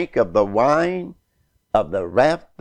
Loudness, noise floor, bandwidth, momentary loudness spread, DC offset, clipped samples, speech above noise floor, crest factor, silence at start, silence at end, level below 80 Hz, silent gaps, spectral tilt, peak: -19 LUFS; -66 dBFS; 9.8 kHz; 7 LU; under 0.1%; under 0.1%; 47 dB; 16 dB; 0 s; 0.2 s; -48 dBFS; none; -6.5 dB/octave; -4 dBFS